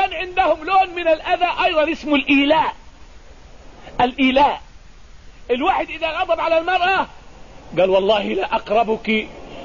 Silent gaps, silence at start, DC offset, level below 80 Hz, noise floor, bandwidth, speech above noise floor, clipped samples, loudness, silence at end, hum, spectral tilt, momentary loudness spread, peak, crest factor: none; 0 s; 0.4%; -44 dBFS; -42 dBFS; 7.4 kHz; 24 dB; under 0.1%; -18 LUFS; 0 s; none; -5 dB/octave; 8 LU; -6 dBFS; 14 dB